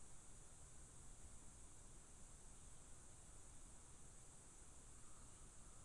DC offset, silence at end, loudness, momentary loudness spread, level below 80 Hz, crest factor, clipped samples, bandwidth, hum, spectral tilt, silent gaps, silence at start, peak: under 0.1%; 0 s; -63 LUFS; 1 LU; -66 dBFS; 12 dB; under 0.1%; 11.5 kHz; none; -3 dB/octave; none; 0 s; -48 dBFS